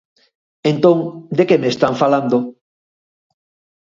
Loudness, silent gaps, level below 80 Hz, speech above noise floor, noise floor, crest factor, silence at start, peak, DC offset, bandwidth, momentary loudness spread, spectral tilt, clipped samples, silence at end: -16 LUFS; none; -62 dBFS; over 75 dB; under -90 dBFS; 18 dB; 0.65 s; 0 dBFS; under 0.1%; 7.6 kHz; 7 LU; -7 dB/octave; under 0.1%; 1.3 s